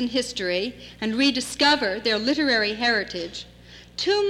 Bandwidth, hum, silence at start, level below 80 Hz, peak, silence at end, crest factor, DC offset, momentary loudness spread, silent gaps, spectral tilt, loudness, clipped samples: 14 kHz; 60 Hz at -55 dBFS; 0 s; -54 dBFS; -10 dBFS; 0 s; 14 dB; under 0.1%; 13 LU; none; -3 dB/octave; -23 LUFS; under 0.1%